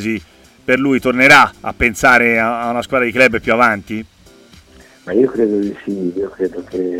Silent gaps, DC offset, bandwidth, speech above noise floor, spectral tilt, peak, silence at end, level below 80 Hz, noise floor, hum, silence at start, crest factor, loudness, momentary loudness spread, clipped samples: none; under 0.1%; 16.5 kHz; 30 dB; -4.5 dB/octave; 0 dBFS; 0 s; -42 dBFS; -44 dBFS; none; 0 s; 16 dB; -13 LUFS; 14 LU; under 0.1%